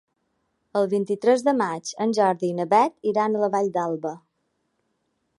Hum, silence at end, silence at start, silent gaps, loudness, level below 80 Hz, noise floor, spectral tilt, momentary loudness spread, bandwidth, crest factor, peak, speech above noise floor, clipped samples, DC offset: none; 1.2 s; 0.75 s; none; -23 LUFS; -74 dBFS; -74 dBFS; -5.5 dB/octave; 8 LU; 11.5 kHz; 18 dB; -6 dBFS; 51 dB; under 0.1%; under 0.1%